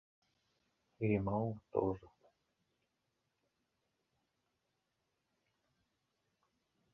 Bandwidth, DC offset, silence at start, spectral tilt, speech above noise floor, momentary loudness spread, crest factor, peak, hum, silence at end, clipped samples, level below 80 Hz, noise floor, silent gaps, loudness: 5.6 kHz; under 0.1%; 1 s; -9.5 dB/octave; 48 dB; 5 LU; 26 dB; -18 dBFS; none; 4.85 s; under 0.1%; -66 dBFS; -85 dBFS; none; -38 LUFS